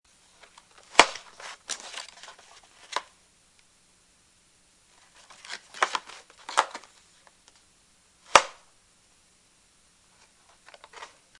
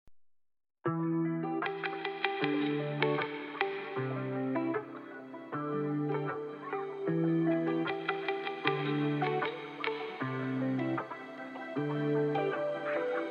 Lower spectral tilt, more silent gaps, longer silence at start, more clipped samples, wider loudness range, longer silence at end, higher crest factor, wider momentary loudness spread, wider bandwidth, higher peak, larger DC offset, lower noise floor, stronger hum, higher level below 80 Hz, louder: second, 0 dB/octave vs -8.5 dB/octave; neither; first, 0.95 s vs 0.05 s; neither; first, 15 LU vs 3 LU; first, 0.35 s vs 0 s; first, 32 dB vs 24 dB; first, 26 LU vs 8 LU; first, 12 kHz vs 6.6 kHz; first, 0 dBFS vs -10 dBFS; neither; about the same, -62 dBFS vs -62 dBFS; neither; first, -64 dBFS vs -84 dBFS; first, -26 LUFS vs -34 LUFS